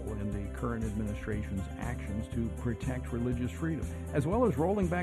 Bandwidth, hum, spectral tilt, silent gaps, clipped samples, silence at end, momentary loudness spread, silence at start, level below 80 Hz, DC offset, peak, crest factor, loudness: 13.5 kHz; none; -8 dB/octave; none; under 0.1%; 0 s; 8 LU; 0 s; -42 dBFS; under 0.1%; -16 dBFS; 16 dB; -34 LUFS